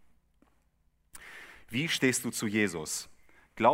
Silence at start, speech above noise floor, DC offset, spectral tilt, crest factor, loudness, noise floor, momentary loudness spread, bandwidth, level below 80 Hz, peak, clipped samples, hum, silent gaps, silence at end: 1.15 s; 40 dB; under 0.1%; -3.5 dB/octave; 24 dB; -30 LUFS; -70 dBFS; 21 LU; 16 kHz; -66 dBFS; -10 dBFS; under 0.1%; 60 Hz at -55 dBFS; none; 0 s